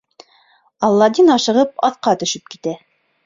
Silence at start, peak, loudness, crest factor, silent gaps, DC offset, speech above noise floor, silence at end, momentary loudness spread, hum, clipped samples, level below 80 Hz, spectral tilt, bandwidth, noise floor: 0.8 s; -2 dBFS; -16 LUFS; 16 dB; none; under 0.1%; 40 dB; 0.5 s; 15 LU; none; under 0.1%; -62 dBFS; -4 dB/octave; 7.6 kHz; -55 dBFS